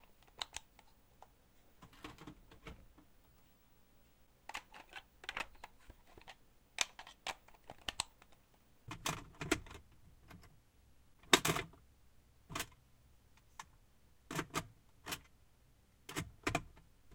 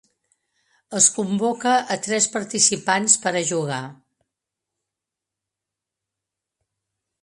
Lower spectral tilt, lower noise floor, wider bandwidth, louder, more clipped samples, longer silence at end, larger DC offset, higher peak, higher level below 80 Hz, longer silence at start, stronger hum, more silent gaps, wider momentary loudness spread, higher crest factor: about the same, -2.5 dB/octave vs -2 dB/octave; second, -68 dBFS vs -86 dBFS; first, 16.5 kHz vs 11.5 kHz; second, -41 LUFS vs -19 LUFS; neither; second, 0 s vs 3.3 s; neither; second, -8 dBFS vs 0 dBFS; first, -64 dBFS vs -70 dBFS; second, 0.05 s vs 0.9 s; neither; neither; first, 21 LU vs 11 LU; first, 38 dB vs 24 dB